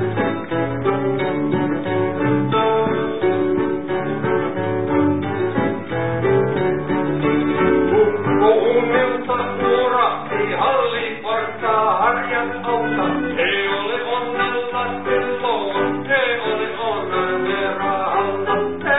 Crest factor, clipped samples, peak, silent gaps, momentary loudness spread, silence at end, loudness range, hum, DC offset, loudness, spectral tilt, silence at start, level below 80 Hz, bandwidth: 16 dB; under 0.1%; -4 dBFS; none; 6 LU; 0 s; 3 LU; none; 1%; -19 LUFS; -11 dB/octave; 0 s; -48 dBFS; 4 kHz